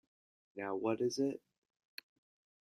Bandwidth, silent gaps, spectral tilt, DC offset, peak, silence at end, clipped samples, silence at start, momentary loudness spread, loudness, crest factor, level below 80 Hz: 15 kHz; none; -5 dB/octave; under 0.1%; -20 dBFS; 1.25 s; under 0.1%; 0.55 s; 19 LU; -38 LUFS; 20 dB; -84 dBFS